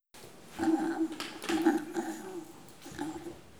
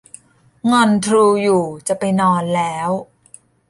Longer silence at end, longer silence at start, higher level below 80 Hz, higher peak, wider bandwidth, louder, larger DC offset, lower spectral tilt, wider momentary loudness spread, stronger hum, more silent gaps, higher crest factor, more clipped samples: second, 0 s vs 0.65 s; second, 0 s vs 0.65 s; second, -68 dBFS vs -58 dBFS; second, -14 dBFS vs -2 dBFS; first, over 20 kHz vs 11.5 kHz; second, -33 LUFS vs -16 LUFS; first, 0.1% vs under 0.1%; about the same, -4.5 dB/octave vs -5.5 dB/octave; first, 20 LU vs 9 LU; neither; neither; about the same, 20 dB vs 16 dB; neither